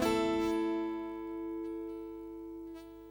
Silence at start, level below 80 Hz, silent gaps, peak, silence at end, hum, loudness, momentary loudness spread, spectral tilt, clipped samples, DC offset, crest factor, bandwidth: 0 s; -60 dBFS; none; -20 dBFS; 0 s; 50 Hz at -65 dBFS; -37 LUFS; 15 LU; -5 dB/octave; under 0.1%; under 0.1%; 16 dB; over 20 kHz